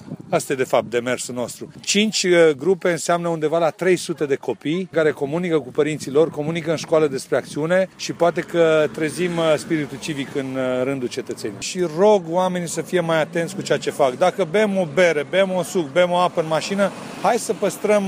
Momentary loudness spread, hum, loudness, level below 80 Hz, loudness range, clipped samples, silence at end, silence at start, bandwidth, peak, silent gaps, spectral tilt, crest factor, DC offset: 8 LU; none; -20 LUFS; -64 dBFS; 2 LU; under 0.1%; 0 s; 0 s; 15.5 kHz; -6 dBFS; none; -4.5 dB/octave; 14 dB; under 0.1%